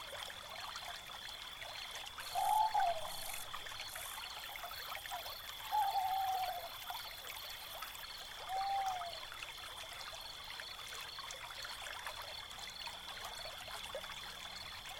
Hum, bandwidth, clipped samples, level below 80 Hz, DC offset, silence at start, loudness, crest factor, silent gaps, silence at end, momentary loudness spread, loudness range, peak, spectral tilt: none; 17.5 kHz; under 0.1%; -64 dBFS; under 0.1%; 0 s; -42 LUFS; 20 dB; none; 0 s; 10 LU; 6 LU; -24 dBFS; -0.5 dB/octave